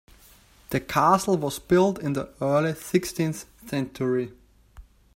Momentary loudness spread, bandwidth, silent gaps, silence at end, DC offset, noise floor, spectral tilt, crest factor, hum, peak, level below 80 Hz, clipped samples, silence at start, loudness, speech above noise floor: 10 LU; 16 kHz; none; 0.35 s; under 0.1%; -54 dBFS; -6 dB/octave; 20 dB; none; -6 dBFS; -54 dBFS; under 0.1%; 0.7 s; -25 LUFS; 30 dB